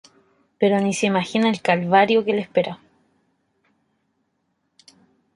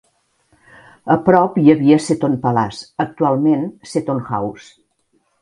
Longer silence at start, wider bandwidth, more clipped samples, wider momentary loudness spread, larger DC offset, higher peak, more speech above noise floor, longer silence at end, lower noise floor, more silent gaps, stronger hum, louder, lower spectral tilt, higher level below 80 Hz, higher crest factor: second, 0.6 s vs 1.05 s; about the same, 11.5 kHz vs 11 kHz; neither; second, 7 LU vs 11 LU; neither; about the same, -2 dBFS vs 0 dBFS; first, 52 dB vs 48 dB; first, 2.6 s vs 0.85 s; first, -71 dBFS vs -64 dBFS; neither; neither; second, -20 LUFS vs -16 LUFS; second, -5 dB/octave vs -7 dB/octave; second, -68 dBFS vs -56 dBFS; about the same, 20 dB vs 18 dB